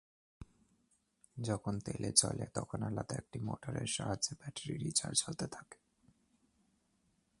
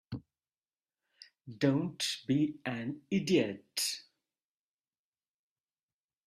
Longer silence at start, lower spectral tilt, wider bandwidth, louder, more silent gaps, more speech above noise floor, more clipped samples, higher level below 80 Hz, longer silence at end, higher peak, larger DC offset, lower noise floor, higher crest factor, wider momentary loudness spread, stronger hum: first, 0.4 s vs 0.1 s; about the same, -3.5 dB/octave vs -4.5 dB/octave; second, 11.5 kHz vs 15.5 kHz; second, -37 LUFS vs -33 LUFS; second, none vs 0.58-0.62 s; second, 39 dB vs over 57 dB; neither; first, -64 dBFS vs -72 dBFS; second, 1.65 s vs 2.25 s; first, -10 dBFS vs -16 dBFS; neither; second, -77 dBFS vs under -90 dBFS; first, 30 dB vs 22 dB; about the same, 14 LU vs 16 LU; neither